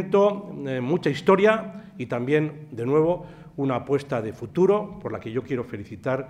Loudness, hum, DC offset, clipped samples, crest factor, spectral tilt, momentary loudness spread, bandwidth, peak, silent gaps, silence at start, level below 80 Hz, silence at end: -24 LUFS; none; under 0.1%; under 0.1%; 18 dB; -7.5 dB/octave; 12 LU; 10.5 kHz; -6 dBFS; none; 0 s; -60 dBFS; 0 s